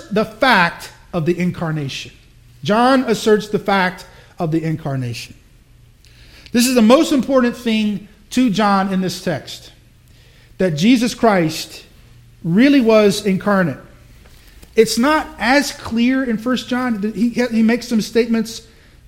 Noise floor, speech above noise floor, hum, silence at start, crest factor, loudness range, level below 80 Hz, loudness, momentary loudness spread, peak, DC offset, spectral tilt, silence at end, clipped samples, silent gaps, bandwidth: -47 dBFS; 31 dB; none; 0 s; 18 dB; 4 LU; -46 dBFS; -16 LUFS; 14 LU; 0 dBFS; under 0.1%; -5 dB/octave; 0.45 s; under 0.1%; none; 16.5 kHz